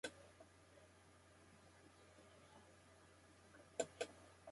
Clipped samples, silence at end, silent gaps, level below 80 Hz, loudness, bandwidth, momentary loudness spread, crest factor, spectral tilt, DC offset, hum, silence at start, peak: under 0.1%; 0 s; none; -78 dBFS; -55 LUFS; 11.5 kHz; 18 LU; 32 dB; -2.5 dB/octave; under 0.1%; none; 0.05 s; -26 dBFS